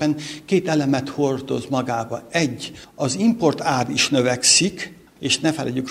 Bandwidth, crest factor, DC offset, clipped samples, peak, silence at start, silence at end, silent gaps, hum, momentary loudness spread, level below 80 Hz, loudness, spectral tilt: 15.5 kHz; 20 dB; under 0.1%; under 0.1%; -2 dBFS; 0 s; 0 s; none; none; 12 LU; -56 dBFS; -20 LUFS; -3.5 dB/octave